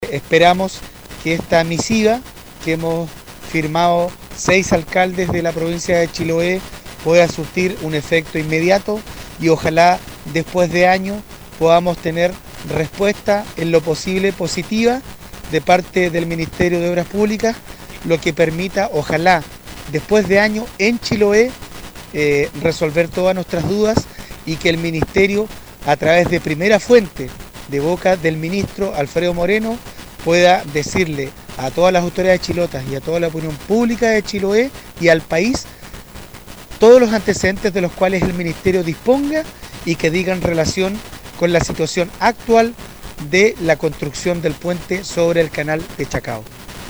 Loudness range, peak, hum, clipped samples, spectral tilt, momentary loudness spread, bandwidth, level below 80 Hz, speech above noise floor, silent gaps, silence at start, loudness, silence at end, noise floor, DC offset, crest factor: 3 LU; 0 dBFS; none; under 0.1%; -5 dB/octave; 14 LU; over 20 kHz; -38 dBFS; 20 dB; none; 0 s; -16 LUFS; 0 s; -36 dBFS; under 0.1%; 16 dB